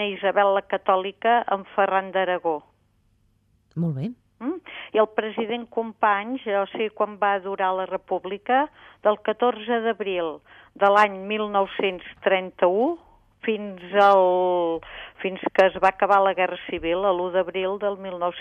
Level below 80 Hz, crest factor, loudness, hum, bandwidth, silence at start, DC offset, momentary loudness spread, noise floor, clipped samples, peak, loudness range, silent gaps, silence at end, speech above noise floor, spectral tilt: -60 dBFS; 18 dB; -23 LUFS; none; 8 kHz; 0 s; under 0.1%; 12 LU; -64 dBFS; under 0.1%; -4 dBFS; 6 LU; none; 0 s; 41 dB; -6.5 dB/octave